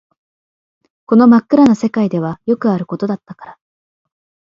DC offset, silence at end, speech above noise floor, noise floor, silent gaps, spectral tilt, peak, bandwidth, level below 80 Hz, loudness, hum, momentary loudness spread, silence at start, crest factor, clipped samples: under 0.1%; 0.9 s; over 77 dB; under -90 dBFS; none; -8 dB/octave; 0 dBFS; 7.4 kHz; -56 dBFS; -13 LUFS; none; 12 LU; 1.1 s; 14 dB; under 0.1%